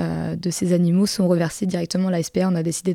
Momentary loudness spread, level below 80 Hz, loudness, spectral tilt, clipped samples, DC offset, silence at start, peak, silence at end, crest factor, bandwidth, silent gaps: 6 LU; -54 dBFS; -21 LUFS; -6 dB/octave; under 0.1%; under 0.1%; 0 s; -6 dBFS; 0 s; 14 dB; 15.5 kHz; none